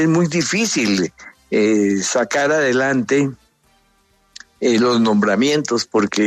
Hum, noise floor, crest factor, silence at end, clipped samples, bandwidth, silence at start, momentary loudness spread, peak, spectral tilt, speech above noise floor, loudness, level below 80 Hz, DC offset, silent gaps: none; -59 dBFS; 12 dB; 0 s; under 0.1%; 13.5 kHz; 0 s; 4 LU; -4 dBFS; -4.5 dB/octave; 42 dB; -17 LUFS; -60 dBFS; under 0.1%; none